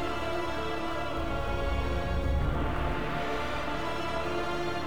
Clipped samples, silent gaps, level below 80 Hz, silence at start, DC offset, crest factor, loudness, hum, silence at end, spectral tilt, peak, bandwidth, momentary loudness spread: under 0.1%; none; -36 dBFS; 0 s; 1%; 14 dB; -32 LUFS; none; 0 s; -6 dB/octave; -18 dBFS; 20 kHz; 3 LU